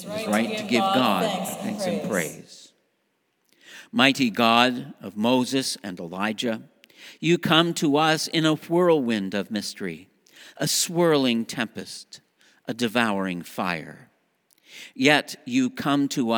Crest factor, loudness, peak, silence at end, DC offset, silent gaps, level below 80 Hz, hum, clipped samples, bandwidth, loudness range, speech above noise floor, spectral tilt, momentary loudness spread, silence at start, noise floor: 24 dB; -23 LUFS; 0 dBFS; 0 s; under 0.1%; none; -72 dBFS; none; under 0.1%; over 20 kHz; 4 LU; 48 dB; -4 dB/octave; 15 LU; 0 s; -72 dBFS